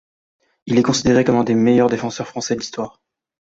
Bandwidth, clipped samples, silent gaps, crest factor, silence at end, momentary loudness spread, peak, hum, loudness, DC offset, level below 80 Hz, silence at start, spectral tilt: 8 kHz; under 0.1%; none; 16 dB; 0.6 s; 12 LU; -2 dBFS; none; -17 LUFS; under 0.1%; -50 dBFS; 0.65 s; -5.5 dB/octave